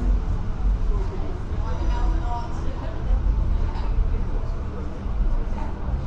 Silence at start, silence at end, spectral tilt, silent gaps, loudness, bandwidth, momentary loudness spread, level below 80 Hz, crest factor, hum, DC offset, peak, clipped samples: 0 s; 0 s; -8 dB/octave; none; -28 LUFS; 6.4 kHz; 6 LU; -24 dBFS; 12 dB; none; under 0.1%; -10 dBFS; under 0.1%